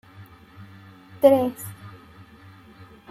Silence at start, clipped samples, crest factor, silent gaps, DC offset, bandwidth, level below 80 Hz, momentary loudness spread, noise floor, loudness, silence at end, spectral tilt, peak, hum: 0.2 s; under 0.1%; 22 dB; none; under 0.1%; 15.5 kHz; -64 dBFS; 28 LU; -48 dBFS; -20 LUFS; 1.2 s; -6.5 dB/octave; -4 dBFS; none